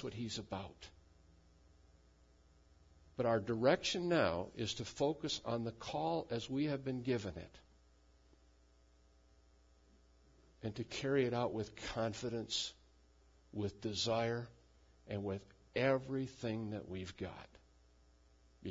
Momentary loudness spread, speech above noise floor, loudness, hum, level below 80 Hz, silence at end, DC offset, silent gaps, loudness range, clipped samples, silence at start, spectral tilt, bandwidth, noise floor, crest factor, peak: 14 LU; 29 dB; -39 LUFS; none; -66 dBFS; 0 s; under 0.1%; none; 8 LU; under 0.1%; 0 s; -4.5 dB/octave; 7.4 kHz; -68 dBFS; 22 dB; -18 dBFS